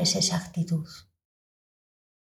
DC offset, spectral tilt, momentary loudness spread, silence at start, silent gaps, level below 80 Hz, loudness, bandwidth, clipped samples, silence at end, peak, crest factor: under 0.1%; -3.5 dB/octave; 20 LU; 0 s; none; -64 dBFS; -27 LUFS; 15 kHz; under 0.1%; 1.25 s; -12 dBFS; 18 dB